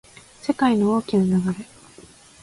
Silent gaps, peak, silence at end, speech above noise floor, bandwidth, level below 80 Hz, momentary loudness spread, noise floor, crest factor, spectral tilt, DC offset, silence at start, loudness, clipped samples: none; -6 dBFS; 0.8 s; 28 dB; 11.5 kHz; -56 dBFS; 13 LU; -48 dBFS; 16 dB; -7 dB/octave; under 0.1%; 0.45 s; -21 LUFS; under 0.1%